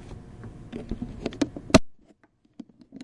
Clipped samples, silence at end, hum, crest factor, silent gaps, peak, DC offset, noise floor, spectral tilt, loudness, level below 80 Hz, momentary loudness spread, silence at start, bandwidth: under 0.1%; 0 s; none; 28 dB; none; 0 dBFS; under 0.1%; -61 dBFS; -5 dB/octave; -26 LUFS; -44 dBFS; 26 LU; 0 s; 11.5 kHz